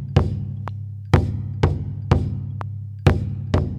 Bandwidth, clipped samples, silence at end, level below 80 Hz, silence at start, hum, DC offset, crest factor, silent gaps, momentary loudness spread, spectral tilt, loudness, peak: 8.8 kHz; under 0.1%; 0 s; -32 dBFS; 0 s; none; under 0.1%; 20 dB; none; 11 LU; -8 dB/octave; -23 LUFS; -2 dBFS